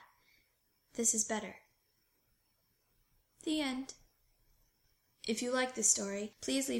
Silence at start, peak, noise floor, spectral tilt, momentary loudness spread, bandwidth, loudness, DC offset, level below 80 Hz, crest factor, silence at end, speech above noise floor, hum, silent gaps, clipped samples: 0 s; -14 dBFS; -77 dBFS; -1.5 dB/octave; 16 LU; 16.5 kHz; -34 LUFS; under 0.1%; -72 dBFS; 24 dB; 0 s; 42 dB; none; none; under 0.1%